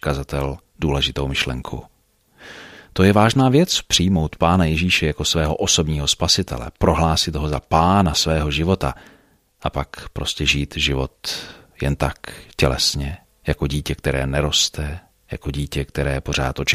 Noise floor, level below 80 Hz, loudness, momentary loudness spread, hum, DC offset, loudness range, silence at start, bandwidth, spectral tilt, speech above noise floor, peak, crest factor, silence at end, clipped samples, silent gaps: -56 dBFS; -32 dBFS; -19 LUFS; 14 LU; none; under 0.1%; 6 LU; 0.05 s; 15.5 kHz; -4 dB/octave; 36 dB; 0 dBFS; 20 dB; 0 s; under 0.1%; none